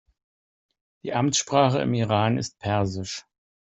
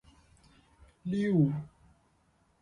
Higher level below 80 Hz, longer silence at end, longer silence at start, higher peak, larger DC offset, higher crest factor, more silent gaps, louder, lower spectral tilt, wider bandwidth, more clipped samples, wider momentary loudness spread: first, -58 dBFS vs -64 dBFS; second, 0.4 s vs 0.95 s; about the same, 1.05 s vs 1.05 s; first, -6 dBFS vs -14 dBFS; neither; about the same, 20 dB vs 20 dB; neither; first, -24 LUFS vs -30 LUFS; second, -5 dB/octave vs -9 dB/octave; second, 8.2 kHz vs 9.8 kHz; neither; second, 13 LU vs 17 LU